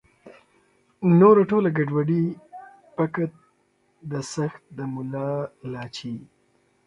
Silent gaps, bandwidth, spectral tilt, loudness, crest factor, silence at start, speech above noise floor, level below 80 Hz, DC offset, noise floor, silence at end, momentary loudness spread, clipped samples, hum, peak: none; 10.5 kHz; -7.5 dB/octave; -23 LUFS; 20 dB; 0.25 s; 44 dB; -66 dBFS; under 0.1%; -66 dBFS; 0.6 s; 22 LU; under 0.1%; none; -4 dBFS